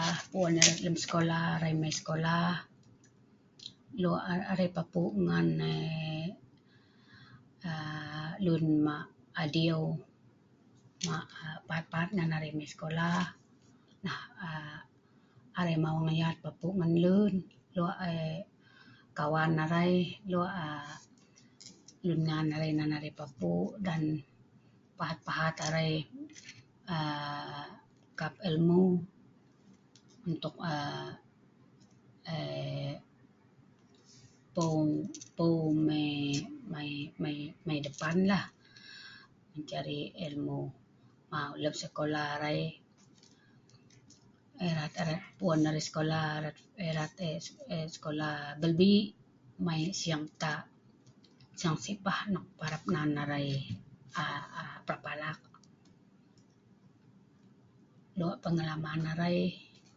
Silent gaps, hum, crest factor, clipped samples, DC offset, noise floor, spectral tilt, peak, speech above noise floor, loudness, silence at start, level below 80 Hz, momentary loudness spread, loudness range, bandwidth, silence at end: none; none; 30 dB; under 0.1%; under 0.1%; -64 dBFS; -5 dB/octave; -4 dBFS; 32 dB; -34 LUFS; 0 s; -66 dBFS; 15 LU; 8 LU; 8 kHz; 0.35 s